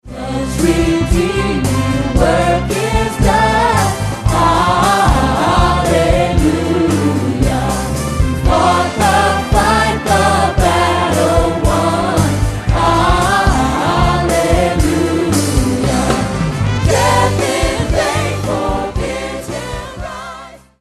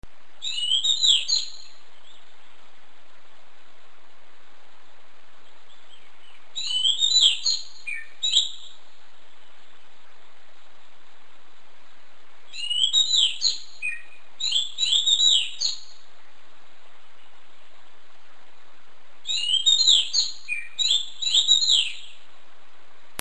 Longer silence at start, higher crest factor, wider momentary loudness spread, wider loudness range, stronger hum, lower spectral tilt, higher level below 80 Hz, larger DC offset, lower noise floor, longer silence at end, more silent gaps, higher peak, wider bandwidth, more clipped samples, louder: second, 0.05 s vs 0.4 s; second, 14 dB vs 24 dB; second, 7 LU vs 17 LU; second, 2 LU vs 10 LU; neither; first, -5 dB/octave vs 3 dB/octave; first, -22 dBFS vs -66 dBFS; second, under 0.1% vs 3%; second, -34 dBFS vs -56 dBFS; second, 0.25 s vs 1.1 s; neither; about the same, 0 dBFS vs -2 dBFS; first, 13 kHz vs 9.6 kHz; neither; first, -14 LUFS vs -20 LUFS